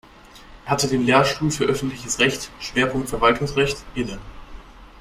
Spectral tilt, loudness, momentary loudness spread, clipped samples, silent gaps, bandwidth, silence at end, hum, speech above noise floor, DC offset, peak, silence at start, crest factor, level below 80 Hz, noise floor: -4 dB/octave; -21 LUFS; 12 LU; under 0.1%; none; 16 kHz; 0.15 s; none; 24 dB; under 0.1%; -2 dBFS; 0.25 s; 20 dB; -42 dBFS; -45 dBFS